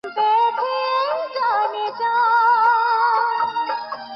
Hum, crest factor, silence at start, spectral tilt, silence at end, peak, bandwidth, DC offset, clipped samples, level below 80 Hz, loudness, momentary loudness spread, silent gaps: none; 12 dB; 0.05 s; -3 dB/octave; 0 s; -6 dBFS; 6 kHz; under 0.1%; under 0.1%; -72 dBFS; -19 LUFS; 8 LU; none